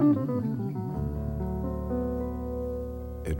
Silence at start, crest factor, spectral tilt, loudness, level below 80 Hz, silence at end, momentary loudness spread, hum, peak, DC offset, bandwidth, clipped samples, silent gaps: 0 s; 16 dB; -10 dB/octave; -31 LUFS; -38 dBFS; 0 s; 6 LU; 60 Hz at -60 dBFS; -14 dBFS; under 0.1%; 16.5 kHz; under 0.1%; none